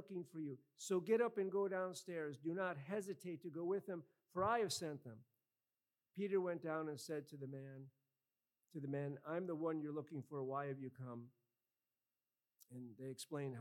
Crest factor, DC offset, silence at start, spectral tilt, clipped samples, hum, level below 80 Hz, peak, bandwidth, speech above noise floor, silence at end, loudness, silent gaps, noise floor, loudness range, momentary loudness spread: 20 dB; under 0.1%; 0 s; -5.5 dB/octave; under 0.1%; none; -88 dBFS; -26 dBFS; 16.5 kHz; over 46 dB; 0 s; -45 LUFS; none; under -90 dBFS; 6 LU; 17 LU